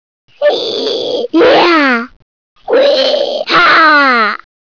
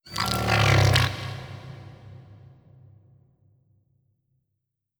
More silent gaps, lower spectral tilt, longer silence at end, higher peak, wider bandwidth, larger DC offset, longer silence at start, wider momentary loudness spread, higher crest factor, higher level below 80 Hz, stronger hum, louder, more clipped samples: first, 2.16-2.56 s vs none; about the same, -3.5 dB/octave vs -4.5 dB/octave; second, 0.35 s vs 2.65 s; about the same, -2 dBFS vs -4 dBFS; second, 5.4 kHz vs over 20 kHz; first, 0.4% vs under 0.1%; first, 0.4 s vs 0.05 s; second, 10 LU vs 24 LU; second, 10 dB vs 24 dB; second, -54 dBFS vs -44 dBFS; neither; first, -9 LUFS vs -22 LUFS; neither